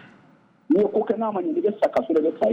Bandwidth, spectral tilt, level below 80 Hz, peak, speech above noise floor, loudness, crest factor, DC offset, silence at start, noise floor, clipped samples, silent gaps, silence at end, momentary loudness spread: 7.4 kHz; -8 dB/octave; -66 dBFS; -10 dBFS; 34 dB; -22 LUFS; 12 dB; under 0.1%; 0.7 s; -56 dBFS; under 0.1%; none; 0 s; 4 LU